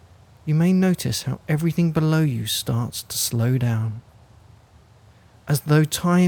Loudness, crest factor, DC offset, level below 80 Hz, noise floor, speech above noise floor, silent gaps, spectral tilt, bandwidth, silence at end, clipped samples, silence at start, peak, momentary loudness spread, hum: -22 LUFS; 14 dB; under 0.1%; -52 dBFS; -51 dBFS; 31 dB; none; -5.5 dB/octave; 19 kHz; 0 s; under 0.1%; 0.45 s; -8 dBFS; 8 LU; none